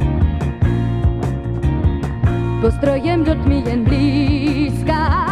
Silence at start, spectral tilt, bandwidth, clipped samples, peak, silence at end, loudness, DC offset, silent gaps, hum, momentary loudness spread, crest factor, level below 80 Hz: 0 s; -8.5 dB/octave; 11.5 kHz; under 0.1%; -2 dBFS; 0 s; -17 LUFS; under 0.1%; none; none; 4 LU; 14 dB; -22 dBFS